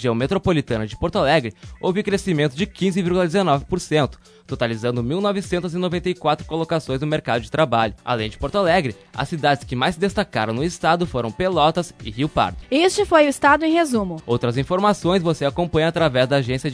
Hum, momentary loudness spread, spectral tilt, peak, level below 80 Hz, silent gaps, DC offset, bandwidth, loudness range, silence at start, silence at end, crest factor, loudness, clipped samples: none; 7 LU; -5.5 dB/octave; -2 dBFS; -42 dBFS; none; under 0.1%; 11 kHz; 4 LU; 0 s; 0 s; 18 dB; -20 LUFS; under 0.1%